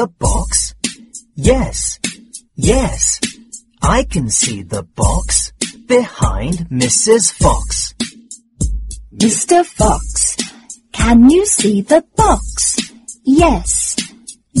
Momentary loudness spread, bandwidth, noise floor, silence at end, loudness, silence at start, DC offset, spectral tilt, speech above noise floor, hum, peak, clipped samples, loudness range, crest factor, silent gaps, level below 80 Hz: 14 LU; 12 kHz; -37 dBFS; 0 s; -14 LUFS; 0 s; under 0.1%; -4 dB/octave; 24 dB; none; 0 dBFS; under 0.1%; 4 LU; 14 dB; none; -24 dBFS